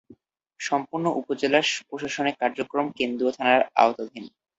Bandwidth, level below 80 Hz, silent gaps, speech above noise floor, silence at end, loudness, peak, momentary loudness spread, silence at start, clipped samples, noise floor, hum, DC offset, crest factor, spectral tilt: 8.2 kHz; -68 dBFS; none; 30 dB; 0.3 s; -24 LUFS; -4 dBFS; 11 LU; 0.1 s; under 0.1%; -55 dBFS; none; under 0.1%; 22 dB; -3.5 dB/octave